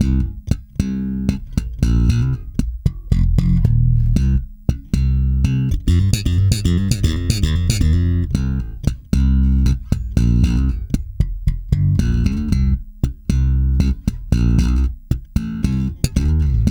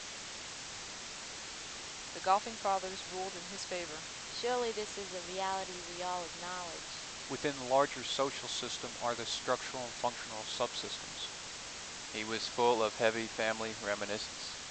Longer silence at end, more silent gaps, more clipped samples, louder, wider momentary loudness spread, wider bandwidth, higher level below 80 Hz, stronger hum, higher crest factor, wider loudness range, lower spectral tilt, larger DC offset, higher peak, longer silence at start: about the same, 0 s vs 0 s; neither; neither; first, -19 LUFS vs -37 LUFS; second, 8 LU vs 11 LU; first, 14 kHz vs 9.4 kHz; first, -20 dBFS vs -66 dBFS; neither; second, 16 dB vs 24 dB; about the same, 2 LU vs 3 LU; first, -7 dB/octave vs -2 dB/octave; neither; first, 0 dBFS vs -14 dBFS; about the same, 0 s vs 0 s